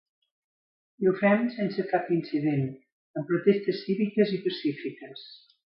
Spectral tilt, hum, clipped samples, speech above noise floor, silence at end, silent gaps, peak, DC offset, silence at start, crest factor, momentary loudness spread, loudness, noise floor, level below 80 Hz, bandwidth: -11 dB/octave; none; under 0.1%; over 63 dB; 0.4 s; 2.92-3.14 s; -8 dBFS; under 0.1%; 1 s; 20 dB; 15 LU; -27 LUFS; under -90 dBFS; -74 dBFS; 5.8 kHz